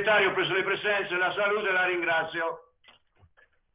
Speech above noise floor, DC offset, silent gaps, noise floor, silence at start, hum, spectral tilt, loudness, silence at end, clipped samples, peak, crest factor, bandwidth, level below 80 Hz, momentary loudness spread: 37 dB; under 0.1%; none; -63 dBFS; 0 s; none; -0.5 dB/octave; -26 LUFS; 1.15 s; under 0.1%; -12 dBFS; 16 dB; 4 kHz; -68 dBFS; 8 LU